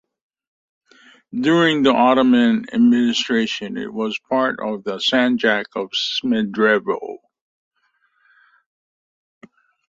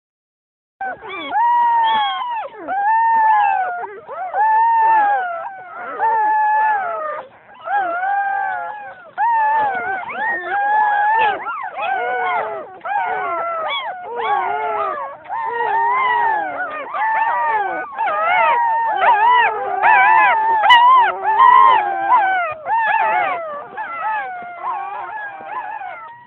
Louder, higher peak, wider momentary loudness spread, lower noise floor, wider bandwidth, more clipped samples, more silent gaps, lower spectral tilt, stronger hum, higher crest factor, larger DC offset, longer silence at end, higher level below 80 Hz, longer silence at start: about the same, -18 LUFS vs -16 LUFS; about the same, -2 dBFS vs 0 dBFS; second, 11 LU vs 16 LU; second, -65 dBFS vs under -90 dBFS; first, 7.8 kHz vs 4.2 kHz; neither; neither; about the same, -4.5 dB/octave vs -3.5 dB/octave; neither; about the same, 18 dB vs 18 dB; neither; first, 2.75 s vs 0.05 s; about the same, -64 dBFS vs -66 dBFS; first, 1.35 s vs 0.8 s